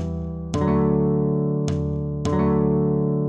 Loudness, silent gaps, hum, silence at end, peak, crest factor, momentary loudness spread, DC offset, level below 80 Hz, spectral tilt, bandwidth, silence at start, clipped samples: -22 LUFS; none; none; 0 s; -8 dBFS; 14 dB; 7 LU; under 0.1%; -38 dBFS; -9 dB/octave; 8.6 kHz; 0 s; under 0.1%